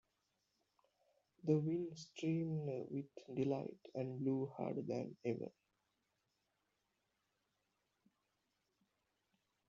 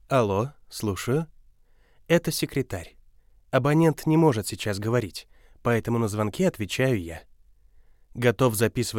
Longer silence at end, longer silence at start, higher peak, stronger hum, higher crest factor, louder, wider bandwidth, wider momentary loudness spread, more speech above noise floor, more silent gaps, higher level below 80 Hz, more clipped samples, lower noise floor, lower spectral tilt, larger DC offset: first, 4.2 s vs 0 s; first, 1.45 s vs 0.1 s; second, -22 dBFS vs -6 dBFS; neither; about the same, 22 dB vs 20 dB; second, -43 LUFS vs -25 LUFS; second, 7.4 kHz vs 17 kHz; second, 10 LU vs 13 LU; first, 45 dB vs 33 dB; neither; second, -84 dBFS vs -54 dBFS; neither; first, -86 dBFS vs -57 dBFS; first, -8.5 dB/octave vs -6 dB/octave; neither